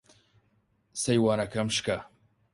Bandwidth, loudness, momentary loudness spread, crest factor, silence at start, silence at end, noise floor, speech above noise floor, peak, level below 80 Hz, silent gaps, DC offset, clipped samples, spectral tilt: 11.5 kHz; -28 LUFS; 10 LU; 20 dB; 0.95 s; 0.45 s; -70 dBFS; 43 dB; -12 dBFS; -60 dBFS; none; under 0.1%; under 0.1%; -4.5 dB/octave